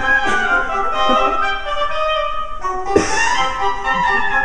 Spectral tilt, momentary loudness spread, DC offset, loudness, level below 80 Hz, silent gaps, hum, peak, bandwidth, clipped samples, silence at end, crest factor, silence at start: -2.5 dB/octave; 6 LU; 6%; -17 LUFS; -32 dBFS; none; none; 0 dBFS; 11 kHz; under 0.1%; 0 s; 18 dB; 0 s